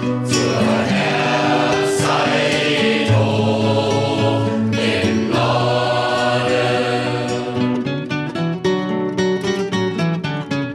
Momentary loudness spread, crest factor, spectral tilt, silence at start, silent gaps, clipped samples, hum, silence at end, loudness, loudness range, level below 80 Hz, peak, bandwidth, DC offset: 5 LU; 14 dB; -5.5 dB/octave; 0 s; none; under 0.1%; none; 0 s; -18 LUFS; 4 LU; -52 dBFS; -4 dBFS; 13 kHz; under 0.1%